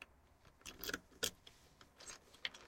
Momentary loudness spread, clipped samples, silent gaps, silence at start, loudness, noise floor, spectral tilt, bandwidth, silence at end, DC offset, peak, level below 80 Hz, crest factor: 20 LU; under 0.1%; none; 0 s; -47 LUFS; -68 dBFS; -1 dB/octave; 16.5 kHz; 0 s; under 0.1%; -18 dBFS; -70 dBFS; 32 dB